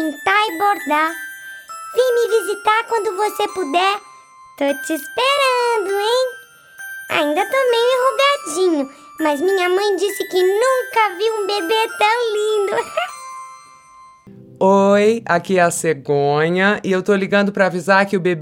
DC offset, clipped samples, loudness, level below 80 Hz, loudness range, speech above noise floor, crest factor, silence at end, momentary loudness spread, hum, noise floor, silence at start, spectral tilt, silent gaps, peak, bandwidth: under 0.1%; under 0.1%; -17 LUFS; -66 dBFS; 3 LU; 28 dB; 16 dB; 0 s; 9 LU; none; -45 dBFS; 0 s; -4 dB/octave; none; -2 dBFS; 18.5 kHz